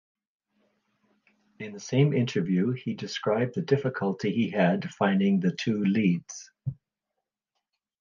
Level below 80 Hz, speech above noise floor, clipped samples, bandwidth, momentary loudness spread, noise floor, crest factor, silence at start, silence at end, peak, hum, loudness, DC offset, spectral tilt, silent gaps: -68 dBFS; 59 dB; under 0.1%; 7.2 kHz; 14 LU; -85 dBFS; 18 dB; 1.6 s; 1.25 s; -10 dBFS; none; -27 LUFS; under 0.1%; -6.5 dB/octave; none